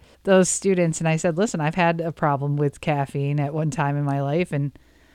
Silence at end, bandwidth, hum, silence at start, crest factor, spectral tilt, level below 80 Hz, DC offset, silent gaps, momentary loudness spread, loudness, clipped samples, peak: 0.45 s; 13 kHz; none; 0.25 s; 18 dB; -5.5 dB/octave; -54 dBFS; under 0.1%; none; 6 LU; -22 LUFS; under 0.1%; -4 dBFS